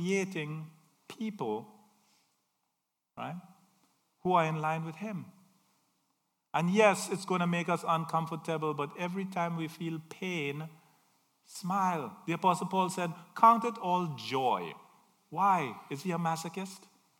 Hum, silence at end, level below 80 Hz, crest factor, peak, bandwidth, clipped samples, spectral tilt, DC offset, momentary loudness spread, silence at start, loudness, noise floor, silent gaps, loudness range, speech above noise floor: none; 0.4 s; -84 dBFS; 26 dB; -8 dBFS; 17 kHz; under 0.1%; -5.5 dB/octave; under 0.1%; 16 LU; 0 s; -32 LUFS; -84 dBFS; none; 8 LU; 52 dB